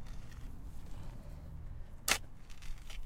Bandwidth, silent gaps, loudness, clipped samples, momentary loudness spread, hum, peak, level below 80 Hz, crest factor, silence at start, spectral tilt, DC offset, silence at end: 16.5 kHz; none; -41 LUFS; under 0.1%; 18 LU; none; -12 dBFS; -46 dBFS; 28 dB; 0 s; -1.5 dB/octave; under 0.1%; 0 s